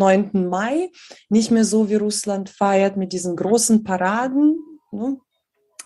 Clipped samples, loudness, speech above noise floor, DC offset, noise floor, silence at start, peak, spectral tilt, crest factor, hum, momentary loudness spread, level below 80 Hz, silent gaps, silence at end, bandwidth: under 0.1%; -19 LUFS; 51 dB; under 0.1%; -69 dBFS; 0 s; -2 dBFS; -5 dB/octave; 16 dB; none; 11 LU; -64 dBFS; none; 0.65 s; 12.5 kHz